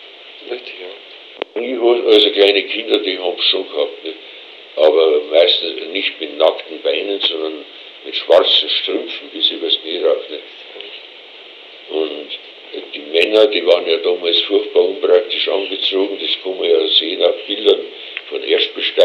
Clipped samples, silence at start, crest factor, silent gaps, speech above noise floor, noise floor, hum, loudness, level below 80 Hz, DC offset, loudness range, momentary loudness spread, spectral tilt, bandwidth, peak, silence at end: under 0.1%; 0 s; 16 dB; none; 22 dB; -38 dBFS; none; -15 LUFS; -76 dBFS; under 0.1%; 6 LU; 20 LU; -2.5 dB/octave; 8 kHz; 0 dBFS; 0 s